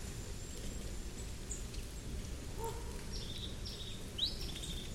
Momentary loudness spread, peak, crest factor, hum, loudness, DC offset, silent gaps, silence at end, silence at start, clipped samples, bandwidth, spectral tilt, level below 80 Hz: 9 LU; -24 dBFS; 18 dB; none; -43 LUFS; under 0.1%; none; 0 s; 0 s; under 0.1%; 16 kHz; -3.5 dB/octave; -46 dBFS